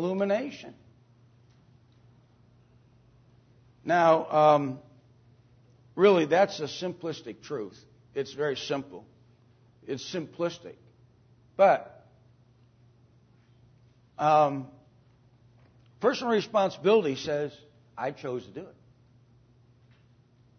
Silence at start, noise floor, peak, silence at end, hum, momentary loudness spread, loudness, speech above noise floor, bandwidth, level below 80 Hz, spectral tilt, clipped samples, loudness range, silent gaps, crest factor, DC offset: 0 s; -61 dBFS; -8 dBFS; 1.9 s; none; 23 LU; -27 LUFS; 34 dB; 6.6 kHz; -72 dBFS; -5.5 dB/octave; under 0.1%; 10 LU; none; 22 dB; under 0.1%